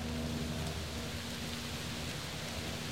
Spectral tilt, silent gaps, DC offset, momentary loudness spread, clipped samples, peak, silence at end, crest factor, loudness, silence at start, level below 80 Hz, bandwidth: -4 dB/octave; none; 0.2%; 2 LU; under 0.1%; -24 dBFS; 0 s; 14 dB; -39 LUFS; 0 s; -48 dBFS; 16 kHz